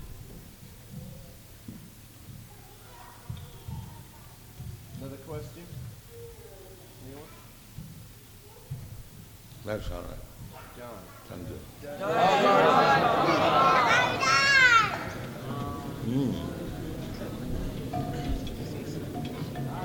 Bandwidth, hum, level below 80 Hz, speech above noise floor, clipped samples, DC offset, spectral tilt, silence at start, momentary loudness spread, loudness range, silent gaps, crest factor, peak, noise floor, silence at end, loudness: 19.5 kHz; none; -46 dBFS; 19 dB; under 0.1%; under 0.1%; -4.5 dB/octave; 0 s; 26 LU; 24 LU; none; 22 dB; -8 dBFS; -49 dBFS; 0 s; -25 LUFS